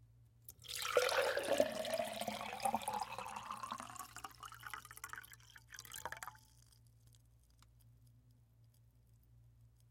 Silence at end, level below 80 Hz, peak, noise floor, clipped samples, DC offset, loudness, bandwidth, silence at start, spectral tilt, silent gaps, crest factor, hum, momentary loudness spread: 0.2 s; -72 dBFS; -18 dBFS; -68 dBFS; under 0.1%; under 0.1%; -41 LUFS; 17 kHz; 0 s; -2.5 dB/octave; none; 26 dB; none; 18 LU